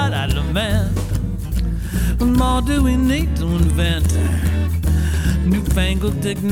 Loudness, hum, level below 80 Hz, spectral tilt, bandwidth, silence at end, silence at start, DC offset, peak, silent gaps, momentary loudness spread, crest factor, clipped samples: -19 LUFS; none; -20 dBFS; -6 dB/octave; 16.5 kHz; 0 s; 0 s; under 0.1%; -4 dBFS; none; 6 LU; 14 dB; under 0.1%